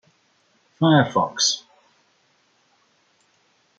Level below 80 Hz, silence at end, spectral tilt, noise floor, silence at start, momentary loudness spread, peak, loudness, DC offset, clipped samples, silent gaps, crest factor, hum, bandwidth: -68 dBFS; 2.2 s; -4 dB/octave; -63 dBFS; 0.8 s; 5 LU; -2 dBFS; -20 LUFS; under 0.1%; under 0.1%; none; 22 dB; none; 9.2 kHz